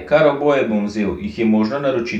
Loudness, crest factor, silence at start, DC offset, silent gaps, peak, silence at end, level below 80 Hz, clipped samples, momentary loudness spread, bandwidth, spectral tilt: -18 LUFS; 16 dB; 0 s; under 0.1%; none; -2 dBFS; 0 s; -46 dBFS; under 0.1%; 7 LU; 7.8 kHz; -7 dB/octave